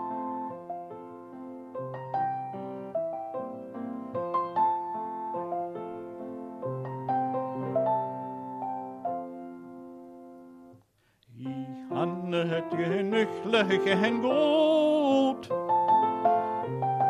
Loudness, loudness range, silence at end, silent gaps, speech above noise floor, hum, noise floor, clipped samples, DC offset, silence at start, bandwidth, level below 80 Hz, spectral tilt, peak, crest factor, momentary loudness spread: -29 LUFS; 12 LU; 0 s; none; 41 dB; none; -66 dBFS; under 0.1%; under 0.1%; 0 s; 11.5 kHz; -76 dBFS; -6.5 dB/octave; -12 dBFS; 18 dB; 19 LU